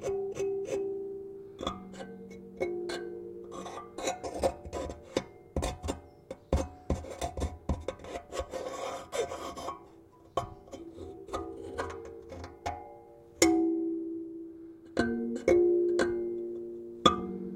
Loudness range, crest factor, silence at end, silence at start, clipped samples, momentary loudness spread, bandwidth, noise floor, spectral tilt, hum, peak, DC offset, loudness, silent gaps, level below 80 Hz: 10 LU; 28 dB; 0 s; 0 s; under 0.1%; 18 LU; 15.5 kHz; -56 dBFS; -4.5 dB/octave; none; -6 dBFS; under 0.1%; -34 LUFS; none; -48 dBFS